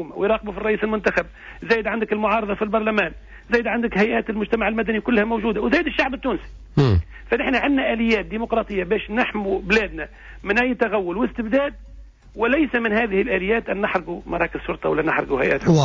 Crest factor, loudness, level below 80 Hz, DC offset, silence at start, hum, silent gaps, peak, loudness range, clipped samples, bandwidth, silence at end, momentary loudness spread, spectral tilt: 16 dB; -21 LUFS; -38 dBFS; under 0.1%; 0 s; none; none; -6 dBFS; 1 LU; under 0.1%; 7.6 kHz; 0 s; 6 LU; -7 dB/octave